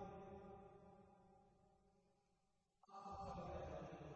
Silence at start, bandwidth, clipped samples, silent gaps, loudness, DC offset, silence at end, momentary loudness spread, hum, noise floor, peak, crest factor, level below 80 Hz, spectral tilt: 0 s; 8 kHz; under 0.1%; none; -56 LUFS; under 0.1%; 0 s; 14 LU; none; -85 dBFS; -40 dBFS; 16 dB; -70 dBFS; -6.5 dB/octave